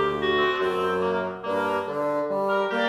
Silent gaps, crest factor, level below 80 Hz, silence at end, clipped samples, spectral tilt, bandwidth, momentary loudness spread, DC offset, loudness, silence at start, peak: none; 12 dB; -56 dBFS; 0 s; under 0.1%; -5.5 dB/octave; 13.5 kHz; 4 LU; under 0.1%; -25 LUFS; 0 s; -12 dBFS